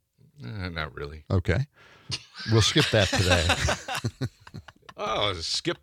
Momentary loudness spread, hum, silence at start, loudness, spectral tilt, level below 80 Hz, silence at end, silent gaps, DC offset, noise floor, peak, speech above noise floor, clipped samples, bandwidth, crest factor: 18 LU; none; 0.4 s; -26 LUFS; -4 dB/octave; -46 dBFS; 0.05 s; none; under 0.1%; -46 dBFS; -6 dBFS; 20 dB; under 0.1%; 15 kHz; 22 dB